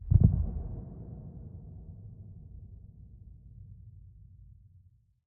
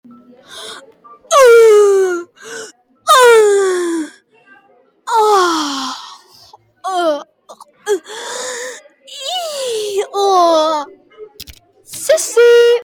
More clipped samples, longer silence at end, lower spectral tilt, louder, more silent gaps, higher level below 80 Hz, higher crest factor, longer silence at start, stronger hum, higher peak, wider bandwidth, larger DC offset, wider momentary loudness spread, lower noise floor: neither; first, 1.25 s vs 0 s; first, -16 dB/octave vs -1 dB/octave; second, -31 LUFS vs -12 LUFS; neither; first, -40 dBFS vs -60 dBFS; first, 26 dB vs 14 dB; second, 0 s vs 0.5 s; neither; second, -8 dBFS vs 0 dBFS; second, 1.3 kHz vs 19 kHz; neither; first, 27 LU vs 23 LU; first, -62 dBFS vs -51 dBFS